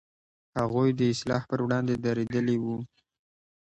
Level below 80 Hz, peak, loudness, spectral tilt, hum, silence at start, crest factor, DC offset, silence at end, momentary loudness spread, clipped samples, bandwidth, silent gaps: -60 dBFS; -12 dBFS; -28 LUFS; -7 dB/octave; none; 0.55 s; 16 dB; under 0.1%; 0.85 s; 10 LU; under 0.1%; 8.8 kHz; none